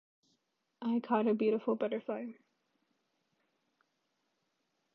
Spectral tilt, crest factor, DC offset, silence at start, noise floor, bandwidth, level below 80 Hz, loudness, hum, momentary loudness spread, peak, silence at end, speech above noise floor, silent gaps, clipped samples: -9 dB/octave; 20 dB; under 0.1%; 0.8 s; -81 dBFS; 5.2 kHz; under -90 dBFS; -34 LUFS; none; 11 LU; -16 dBFS; 2.6 s; 48 dB; none; under 0.1%